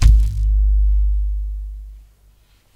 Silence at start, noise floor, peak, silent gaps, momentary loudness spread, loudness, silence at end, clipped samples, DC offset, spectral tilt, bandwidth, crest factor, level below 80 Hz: 0 s; -53 dBFS; 0 dBFS; none; 16 LU; -20 LUFS; 0.75 s; under 0.1%; under 0.1%; -6 dB/octave; 7.6 kHz; 16 dB; -16 dBFS